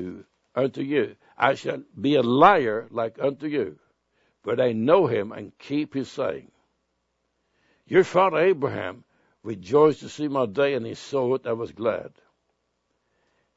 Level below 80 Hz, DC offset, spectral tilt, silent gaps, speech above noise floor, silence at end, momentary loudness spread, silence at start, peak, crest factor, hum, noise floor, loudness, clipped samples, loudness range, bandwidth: -66 dBFS; under 0.1%; -6.5 dB/octave; none; 52 dB; 1.5 s; 14 LU; 0 s; -2 dBFS; 24 dB; none; -75 dBFS; -24 LUFS; under 0.1%; 5 LU; 8 kHz